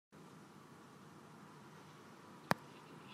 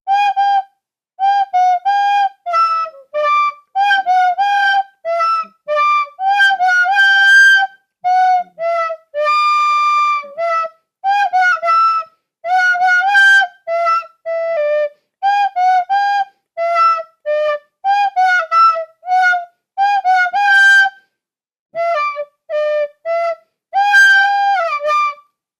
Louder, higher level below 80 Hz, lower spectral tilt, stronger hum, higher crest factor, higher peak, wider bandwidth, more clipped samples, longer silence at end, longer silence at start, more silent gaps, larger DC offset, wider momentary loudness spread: second, -48 LUFS vs -13 LUFS; second, -86 dBFS vs -76 dBFS; first, -5 dB/octave vs 2 dB/octave; neither; first, 38 dB vs 12 dB; second, -12 dBFS vs -2 dBFS; first, 15.5 kHz vs 14 kHz; neither; second, 0 s vs 0.45 s; about the same, 0.1 s vs 0.05 s; second, none vs 21.59-21.66 s; neither; first, 18 LU vs 12 LU